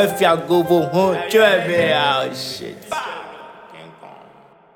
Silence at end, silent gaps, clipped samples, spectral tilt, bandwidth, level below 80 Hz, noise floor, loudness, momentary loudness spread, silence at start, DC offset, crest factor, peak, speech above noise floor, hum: 0.65 s; none; under 0.1%; -4.5 dB/octave; 17.5 kHz; -60 dBFS; -48 dBFS; -17 LUFS; 18 LU; 0 s; under 0.1%; 18 dB; -2 dBFS; 30 dB; none